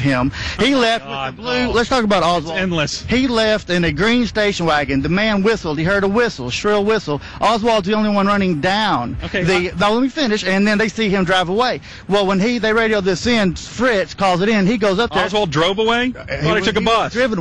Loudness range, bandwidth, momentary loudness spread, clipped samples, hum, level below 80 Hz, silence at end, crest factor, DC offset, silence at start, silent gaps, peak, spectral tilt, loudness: 1 LU; 11 kHz; 4 LU; under 0.1%; none; -38 dBFS; 0 s; 12 dB; 0.6%; 0 s; none; -4 dBFS; -5 dB/octave; -17 LUFS